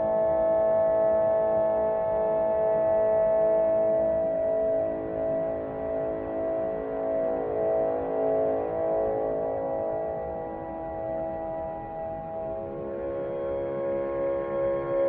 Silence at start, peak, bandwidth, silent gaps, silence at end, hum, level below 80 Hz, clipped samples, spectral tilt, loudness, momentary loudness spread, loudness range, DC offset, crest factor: 0 s; -14 dBFS; 3.5 kHz; none; 0 s; none; -52 dBFS; under 0.1%; -7.5 dB/octave; -27 LUFS; 10 LU; 8 LU; under 0.1%; 12 dB